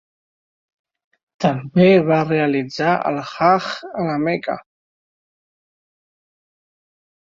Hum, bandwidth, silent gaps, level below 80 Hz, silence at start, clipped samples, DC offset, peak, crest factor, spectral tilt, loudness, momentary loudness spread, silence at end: none; 7.6 kHz; none; -60 dBFS; 1.4 s; under 0.1%; under 0.1%; -2 dBFS; 18 dB; -7 dB/octave; -18 LUFS; 11 LU; 2.7 s